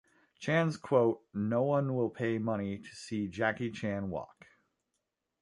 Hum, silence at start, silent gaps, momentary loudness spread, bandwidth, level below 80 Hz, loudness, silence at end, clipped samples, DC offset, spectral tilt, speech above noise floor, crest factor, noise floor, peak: none; 0.4 s; none; 11 LU; 11.5 kHz; -64 dBFS; -33 LUFS; 1.15 s; under 0.1%; under 0.1%; -7 dB/octave; 52 dB; 20 dB; -85 dBFS; -14 dBFS